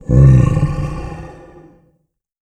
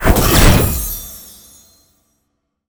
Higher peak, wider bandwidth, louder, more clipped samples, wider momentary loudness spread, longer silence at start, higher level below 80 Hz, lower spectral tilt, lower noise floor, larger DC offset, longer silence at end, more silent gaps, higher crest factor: about the same, 0 dBFS vs 0 dBFS; second, 8.6 kHz vs over 20 kHz; about the same, -13 LUFS vs -13 LUFS; neither; about the same, 23 LU vs 21 LU; about the same, 0.1 s vs 0 s; about the same, -24 dBFS vs -20 dBFS; first, -9.5 dB/octave vs -4.5 dB/octave; second, -65 dBFS vs -70 dBFS; neither; second, 1.1 s vs 1.45 s; neither; about the same, 14 dB vs 16 dB